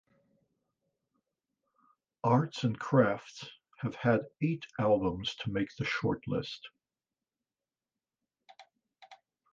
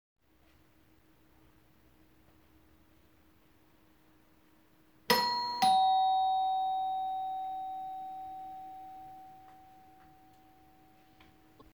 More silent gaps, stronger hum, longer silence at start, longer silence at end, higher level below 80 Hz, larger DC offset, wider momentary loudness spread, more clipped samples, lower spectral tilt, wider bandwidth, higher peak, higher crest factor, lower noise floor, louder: neither; neither; second, 2.25 s vs 5.1 s; second, 0.4 s vs 2.15 s; first, -62 dBFS vs -72 dBFS; neither; second, 16 LU vs 24 LU; neither; first, -7 dB/octave vs -2 dB/octave; second, 7.6 kHz vs over 20 kHz; about the same, -12 dBFS vs -10 dBFS; about the same, 22 dB vs 26 dB; first, under -90 dBFS vs -66 dBFS; about the same, -32 LUFS vs -31 LUFS